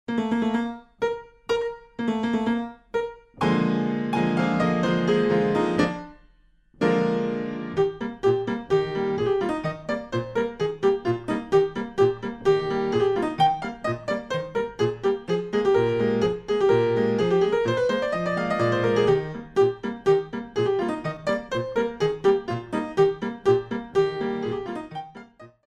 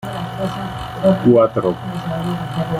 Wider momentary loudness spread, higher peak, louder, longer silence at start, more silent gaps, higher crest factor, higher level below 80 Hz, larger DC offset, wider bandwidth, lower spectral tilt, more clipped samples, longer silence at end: second, 8 LU vs 13 LU; second, -8 dBFS vs -2 dBFS; second, -24 LUFS vs -18 LUFS; about the same, 0.1 s vs 0 s; neither; about the same, 16 dB vs 16 dB; second, -54 dBFS vs -44 dBFS; neither; second, 9.6 kHz vs 15.5 kHz; about the same, -7 dB/octave vs -8 dB/octave; neither; first, 0.2 s vs 0 s